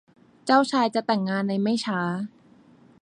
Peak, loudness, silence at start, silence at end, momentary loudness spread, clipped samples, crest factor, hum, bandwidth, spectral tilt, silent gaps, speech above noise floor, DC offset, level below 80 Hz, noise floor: -6 dBFS; -24 LUFS; 0.45 s; 0.75 s; 12 LU; under 0.1%; 20 dB; none; 10.5 kHz; -5.5 dB/octave; none; 31 dB; under 0.1%; -72 dBFS; -54 dBFS